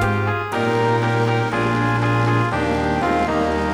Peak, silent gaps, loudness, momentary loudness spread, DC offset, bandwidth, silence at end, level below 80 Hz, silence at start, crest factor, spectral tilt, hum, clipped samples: -6 dBFS; none; -19 LUFS; 2 LU; under 0.1%; over 20 kHz; 0 s; -38 dBFS; 0 s; 12 dB; -7 dB/octave; none; under 0.1%